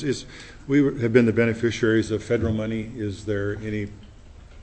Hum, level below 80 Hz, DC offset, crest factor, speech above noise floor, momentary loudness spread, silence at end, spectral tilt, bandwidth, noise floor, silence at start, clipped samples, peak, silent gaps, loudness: none; -46 dBFS; under 0.1%; 20 dB; 22 dB; 12 LU; 0 s; -6.5 dB/octave; 8.6 kHz; -45 dBFS; 0 s; under 0.1%; -2 dBFS; none; -23 LUFS